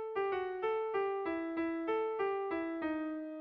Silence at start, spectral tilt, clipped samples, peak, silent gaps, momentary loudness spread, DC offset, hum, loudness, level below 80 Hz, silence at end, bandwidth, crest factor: 0 s; -3 dB/octave; under 0.1%; -26 dBFS; none; 3 LU; under 0.1%; none; -36 LUFS; -72 dBFS; 0 s; 5.4 kHz; 10 dB